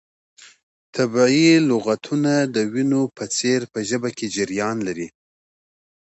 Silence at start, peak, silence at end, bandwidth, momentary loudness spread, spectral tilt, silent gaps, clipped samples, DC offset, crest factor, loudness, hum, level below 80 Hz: 0.4 s; -4 dBFS; 1.05 s; 8.2 kHz; 11 LU; -4.5 dB/octave; 0.63-0.93 s; under 0.1%; under 0.1%; 18 dB; -20 LUFS; none; -64 dBFS